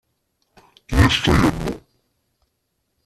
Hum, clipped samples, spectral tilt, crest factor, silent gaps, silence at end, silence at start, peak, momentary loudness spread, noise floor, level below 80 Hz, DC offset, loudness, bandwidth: none; under 0.1%; -5.5 dB/octave; 20 dB; none; 1.25 s; 0.9 s; -2 dBFS; 14 LU; -73 dBFS; -32 dBFS; under 0.1%; -18 LUFS; 14 kHz